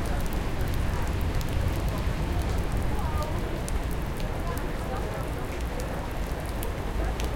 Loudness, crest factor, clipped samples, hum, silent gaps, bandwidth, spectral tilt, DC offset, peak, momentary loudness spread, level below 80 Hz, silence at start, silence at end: -31 LUFS; 16 dB; under 0.1%; none; none; 17 kHz; -6 dB/octave; under 0.1%; -12 dBFS; 4 LU; -30 dBFS; 0 s; 0 s